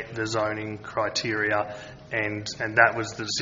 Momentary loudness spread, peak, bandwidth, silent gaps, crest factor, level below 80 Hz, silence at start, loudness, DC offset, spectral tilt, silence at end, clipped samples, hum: 12 LU; -2 dBFS; 7.6 kHz; none; 24 dB; -58 dBFS; 0 s; -26 LUFS; under 0.1%; -3.5 dB/octave; 0 s; under 0.1%; none